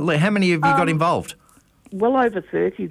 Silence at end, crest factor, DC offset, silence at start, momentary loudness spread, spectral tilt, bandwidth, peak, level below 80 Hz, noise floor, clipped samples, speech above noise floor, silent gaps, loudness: 0 s; 12 dB; under 0.1%; 0 s; 8 LU; -6.5 dB/octave; 14.5 kHz; -8 dBFS; -54 dBFS; -53 dBFS; under 0.1%; 34 dB; none; -19 LUFS